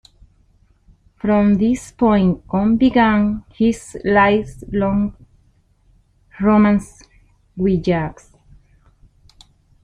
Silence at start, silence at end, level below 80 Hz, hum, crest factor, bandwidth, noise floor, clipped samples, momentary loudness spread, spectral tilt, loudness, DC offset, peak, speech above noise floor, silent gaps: 1.25 s; 1.7 s; -42 dBFS; none; 16 dB; 10.5 kHz; -57 dBFS; under 0.1%; 9 LU; -7.5 dB/octave; -17 LUFS; under 0.1%; -2 dBFS; 40 dB; none